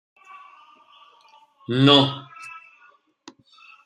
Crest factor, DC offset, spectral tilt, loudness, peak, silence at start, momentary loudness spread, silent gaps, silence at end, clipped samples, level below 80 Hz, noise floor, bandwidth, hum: 24 dB; under 0.1%; -6 dB/octave; -17 LUFS; -2 dBFS; 1.7 s; 27 LU; none; 1.3 s; under 0.1%; -68 dBFS; -57 dBFS; 9.6 kHz; none